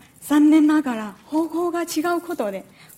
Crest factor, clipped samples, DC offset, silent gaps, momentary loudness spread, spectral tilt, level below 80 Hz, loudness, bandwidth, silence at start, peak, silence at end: 14 dB; under 0.1%; under 0.1%; none; 13 LU; -4.5 dB/octave; -66 dBFS; -21 LUFS; 16 kHz; 0.2 s; -6 dBFS; 0.35 s